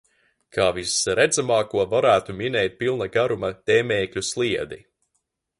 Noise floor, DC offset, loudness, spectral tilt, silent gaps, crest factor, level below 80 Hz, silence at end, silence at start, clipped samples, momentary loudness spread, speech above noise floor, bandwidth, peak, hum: -75 dBFS; under 0.1%; -22 LUFS; -3.5 dB/octave; none; 18 dB; -54 dBFS; 0.8 s; 0.55 s; under 0.1%; 7 LU; 53 dB; 11.5 kHz; -6 dBFS; none